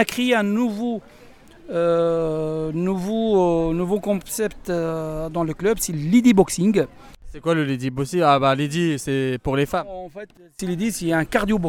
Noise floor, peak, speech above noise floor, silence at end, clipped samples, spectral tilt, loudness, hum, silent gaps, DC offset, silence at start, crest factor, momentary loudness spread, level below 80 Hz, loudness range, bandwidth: -45 dBFS; -2 dBFS; 25 dB; 0 s; under 0.1%; -5.5 dB/octave; -21 LUFS; none; none; under 0.1%; 0 s; 20 dB; 11 LU; -44 dBFS; 3 LU; 18 kHz